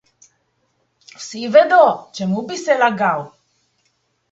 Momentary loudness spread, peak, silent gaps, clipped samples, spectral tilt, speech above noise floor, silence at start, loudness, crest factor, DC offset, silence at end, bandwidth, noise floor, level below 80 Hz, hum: 18 LU; 0 dBFS; none; under 0.1%; -5 dB/octave; 51 dB; 1.2 s; -16 LUFS; 18 dB; under 0.1%; 1.05 s; 8 kHz; -66 dBFS; -68 dBFS; none